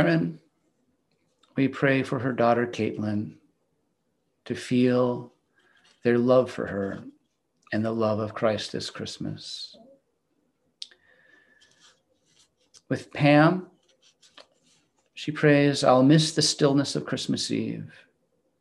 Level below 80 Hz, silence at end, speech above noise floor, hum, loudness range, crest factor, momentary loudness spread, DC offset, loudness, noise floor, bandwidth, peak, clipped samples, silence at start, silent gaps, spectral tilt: -68 dBFS; 0.75 s; 51 dB; none; 11 LU; 22 dB; 17 LU; under 0.1%; -24 LUFS; -75 dBFS; 12 kHz; -6 dBFS; under 0.1%; 0 s; none; -5.5 dB/octave